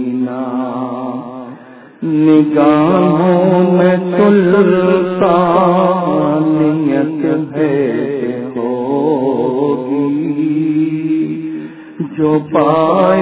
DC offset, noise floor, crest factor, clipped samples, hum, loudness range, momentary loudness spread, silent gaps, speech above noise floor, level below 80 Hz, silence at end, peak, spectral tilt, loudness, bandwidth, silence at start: under 0.1%; -35 dBFS; 12 dB; under 0.1%; none; 5 LU; 11 LU; none; 25 dB; -54 dBFS; 0 s; 0 dBFS; -12 dB/octave; -13 LUFS; 4 kHz; 0 s